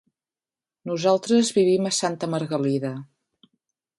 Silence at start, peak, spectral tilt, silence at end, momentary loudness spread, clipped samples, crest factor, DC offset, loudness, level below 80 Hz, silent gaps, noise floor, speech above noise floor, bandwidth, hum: 0.85 s; -6 dBFS; -5 dB/octave; 0.95 s; 12 LU; under 0.1%; 18 dB; under 0.1%; -23 LUFS; -70 dBFS; none; under -90 dBFS; over 68 dB; 11.5 kHz; none